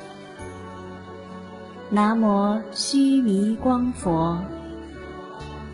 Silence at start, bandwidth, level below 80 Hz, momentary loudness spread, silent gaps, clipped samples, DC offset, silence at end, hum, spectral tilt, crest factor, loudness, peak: 0 s; 11 kHz; -48 dBFS; 20 LU; none; under 0.1%; under 0.1%; 0 s; none; -5.5 dB/octave; 16 dB; -22 LUFS; -8 dBFS